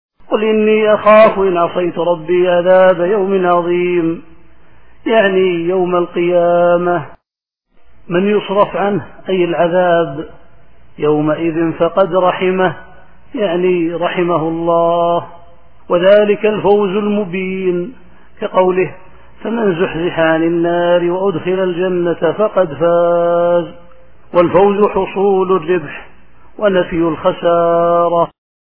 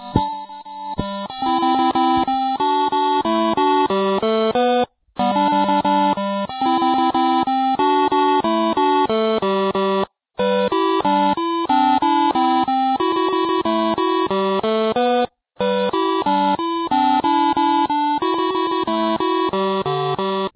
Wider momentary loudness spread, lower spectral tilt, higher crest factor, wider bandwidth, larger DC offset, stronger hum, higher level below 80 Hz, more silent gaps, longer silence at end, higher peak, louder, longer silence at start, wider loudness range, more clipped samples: first, 9 LU vs 5 LU; about the same, -10.5 dB/octave vs -9.5 dB/octave; about the same, 14 dB vs 18 dB; about the same, 4.2 kHz vs 4 kHz; first, 2% vs under 0.1%; neither; about the same, -48 dBFS vs -50 dBFS; neither; first, 0.4 s vs 0.05 s; about the same, 0 dBFS vs 0 dBFS; first, -13 LUFS vs -18 LUFS; about the same, 0.1 s vs 0 s; about the same, 3 LU vs 2 LU; neither